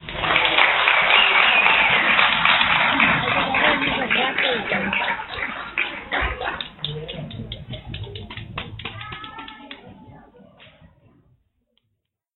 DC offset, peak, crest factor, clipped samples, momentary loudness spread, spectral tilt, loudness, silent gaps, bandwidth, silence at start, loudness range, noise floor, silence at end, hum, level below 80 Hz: under 0.1%; 0 dBFS; 22 dB; under 0.1%; 20 LU; -7.5 dB/octave; -17 LUFS; none; 4.5 kHz; 0 s; 21 LU; -76 dBFS; 2.2 s; none; -44 dBFS